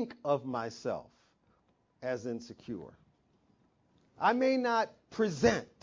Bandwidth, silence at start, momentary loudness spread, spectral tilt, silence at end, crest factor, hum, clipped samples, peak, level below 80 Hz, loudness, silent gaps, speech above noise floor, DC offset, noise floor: 7.6 kHz; 0 s; 15 LU; -5.5 dB/octave; 0.15 s; 22 dB; none; under 0.1%; -12 dBFS; -64 dBFS; -32 LUFS; none; 39 dB; under 0.1%; -72 dBFS